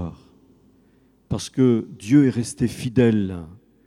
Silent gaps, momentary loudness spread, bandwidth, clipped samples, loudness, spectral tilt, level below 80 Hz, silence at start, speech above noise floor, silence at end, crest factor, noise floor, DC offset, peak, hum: none; 13 LU; 13.5 kHz; under 0.1%; -21 LUFS; -7 dB/octave; -50 dBFS; 0 s; 38 dB; 0.3 s; 18 dB; -58 dBFS; under 0.1%; -4 dBFS; none